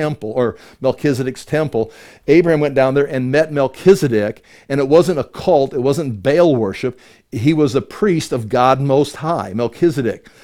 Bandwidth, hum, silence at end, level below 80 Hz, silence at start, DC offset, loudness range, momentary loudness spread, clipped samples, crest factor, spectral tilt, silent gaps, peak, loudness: 16 kHz; none; 0.25 s; -50 dBFS; 0 s; under 0.1%; 2 LU; 9 LU; under 0.1%; 16 dB; -7 dB/octave; none; 0 dBFS; -16 LUFS